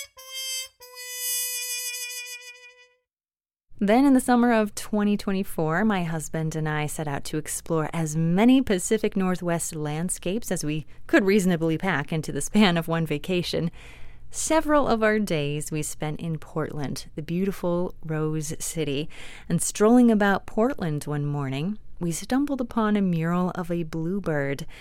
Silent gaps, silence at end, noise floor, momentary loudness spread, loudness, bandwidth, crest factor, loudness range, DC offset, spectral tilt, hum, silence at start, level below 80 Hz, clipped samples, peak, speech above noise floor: none; 0 s; under -90 dBFS; 12 LU; -25 LUFS; 16.5 kHz; 20 dB; 5 LU; under 0.1%; -5 dB/octave; none; 0 s; -44 dBFS; under 0.1%; -6 dBFS; over 66 dB